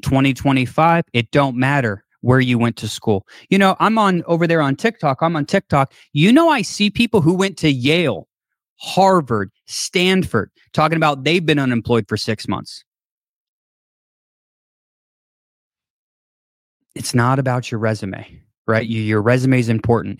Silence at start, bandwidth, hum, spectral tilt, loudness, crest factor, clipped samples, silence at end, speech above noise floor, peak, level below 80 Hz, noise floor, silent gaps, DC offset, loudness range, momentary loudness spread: 0.05 s; 16 kHz; none; -6 dB/octave; -17 LUFS; 16 dB; under 0.1%; 0.05 s; over 73 dB; -2 dBFS; -48 dBFS; under -90 dBFS; 8.69-8.76 s, 12.86-12.92 s, 13.10-15.70 s, 15.90-16.80 s, 18.57-18.65 s; under 0.1%; 8 LU; 9 LU